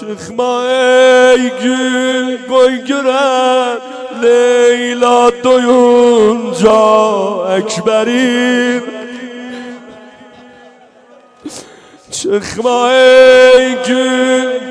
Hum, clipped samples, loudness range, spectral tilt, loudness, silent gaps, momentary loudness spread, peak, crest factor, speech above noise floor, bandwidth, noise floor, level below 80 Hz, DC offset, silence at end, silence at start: none; 0.3%; 12 LU; -3.5 dB/octave; -10 LUFS; none; 18 LU; 0 dBFS; 10 dB; 33 dB; 11 kHz; -42 dBFS; -52 dBFS; under 0.1%; 0 s; 0 s